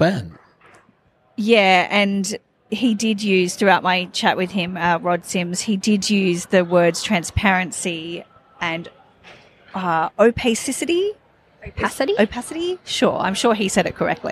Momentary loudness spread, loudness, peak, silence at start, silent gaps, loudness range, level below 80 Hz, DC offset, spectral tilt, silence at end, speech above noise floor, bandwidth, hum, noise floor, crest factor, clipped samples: 11 LU; -19 LUFS; -2 dBFS; 0 s; none; 4 LU; -46 dBFS; under 0.1%; -4 dB/octave; 0 s; 39 dB; 15 kHz; none; -58 dBFS; 18 dB; under 0.1%